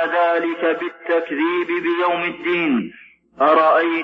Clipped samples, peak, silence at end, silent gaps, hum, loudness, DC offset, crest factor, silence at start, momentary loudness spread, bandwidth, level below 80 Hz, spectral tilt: under 0.1%; -2 dBFS; 0 s; none; none; -19 LUFS; under 0.1%; 16 dB; 0 s; 7 LU; 5.4 kHz; -66 dBFS; -7 dB/octave